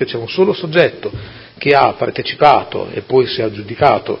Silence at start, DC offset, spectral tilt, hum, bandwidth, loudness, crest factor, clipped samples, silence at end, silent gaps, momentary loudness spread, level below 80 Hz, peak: 0 s; under 0.1%; -7.5 dB/octave; none; 6.4 kHz; -14 LUFS; 14 dB; 0.1%; 0 s; none; 13 LU; -46 dBFS; 0 dBFS